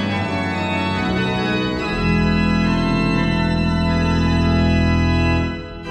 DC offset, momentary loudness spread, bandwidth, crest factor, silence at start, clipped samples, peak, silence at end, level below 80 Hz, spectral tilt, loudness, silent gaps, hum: under 0.1%; 4 LU; 9.4 kHz; 12 dB; 0 s; under 0.1%; -6 dBFS; 0 s; -28 dBFS; -7 dB/octave; -18 LUFS; none; none